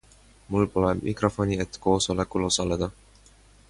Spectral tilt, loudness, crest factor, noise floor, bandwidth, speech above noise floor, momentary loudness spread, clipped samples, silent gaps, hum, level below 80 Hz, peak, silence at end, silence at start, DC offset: -5 dB/octave; -26 LUFS; 20 dB; -55 dBFS; 11.5 kHz; 30 dB; 5 LU; under 0.1%; none; none; -44 dBFS; -8 dBFS; 0.8 s; 0.5 s; under 0.1%